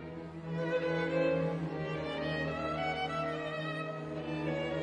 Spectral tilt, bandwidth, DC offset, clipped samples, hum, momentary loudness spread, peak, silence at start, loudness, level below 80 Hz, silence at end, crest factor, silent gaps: -7 dB/octave; 9.8 kHz; under 0.1%; under 0.1%; none; 8 LU; -20 dBFS; 0 s; -35 LUFS; -60 dBFS; 0 s; 16 dB; none